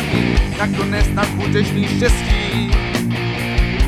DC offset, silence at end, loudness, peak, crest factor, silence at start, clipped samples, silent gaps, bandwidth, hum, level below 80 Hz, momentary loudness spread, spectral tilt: under 0.1%; 0 s; -18 LUFS; -2 dBFS; 14 dB; 0 s; under 0.1%; none; 16 kHz; none; -20 dBFS; 3 LU; -5.5 dB/octave